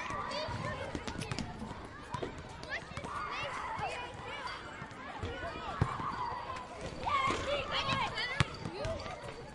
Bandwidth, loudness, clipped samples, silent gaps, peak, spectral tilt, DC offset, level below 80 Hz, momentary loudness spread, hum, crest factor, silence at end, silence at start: 11.5 kHz; -38 LUFS; under 0.1%; none; -6 dBFS; -4.5 dB/octave; under 0.1%; -54 dBFS; 11 LU; none; 32 dB; 0 s; 0 s